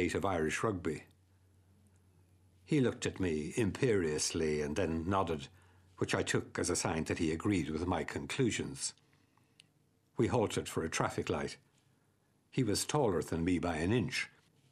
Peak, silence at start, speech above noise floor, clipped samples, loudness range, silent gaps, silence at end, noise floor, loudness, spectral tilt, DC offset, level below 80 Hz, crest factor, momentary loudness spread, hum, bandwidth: -14 dBFS; 0 s; 39 dB; under 0.1%; 3 LU; none; 0.45 s; -73 dBFS; -35 LUFS; -5 dB/octave; under 0.1%; -58 dBFS; 20 dB; 8 LU; none; 13.5 kHz